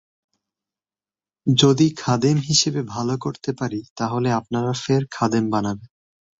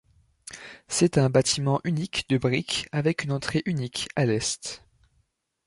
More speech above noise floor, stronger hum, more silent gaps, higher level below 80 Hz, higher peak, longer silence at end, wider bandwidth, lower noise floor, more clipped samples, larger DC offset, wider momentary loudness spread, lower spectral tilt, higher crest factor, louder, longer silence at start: first, over 70 dB vs 46 dB; neither; first, 3.90-3.96 s vs none; about the same, -56 dBFS vs -56 dBFS; first, -2 dBFS vs -8 dBFS; second, 0.55 s vs 0.9 s; second, 8.2 kHz vs 11.5 kHz; first, under -90 dBFS vs -71 dBFS; neither; neither; second, 11 LU vs 19 LU; about the same, -5 dB/octave vs -4.5 dB/octave; about the same, 20 dB vs 20 dB; first, -21 LUFS vs -25 LUFS; first, 1.45 s vs 0.5 s